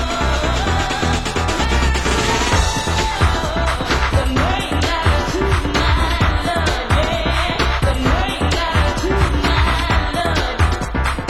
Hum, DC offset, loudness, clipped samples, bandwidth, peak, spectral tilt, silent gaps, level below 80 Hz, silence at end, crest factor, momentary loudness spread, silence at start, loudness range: none; 0.8%; -17 LUFS; under 0.1%; 16 kHz; -2 dBFS; -4.5 dB/octave; none; -20 dBFS; 0 s; 14 dB; 2 LU; 0 s; 0 LU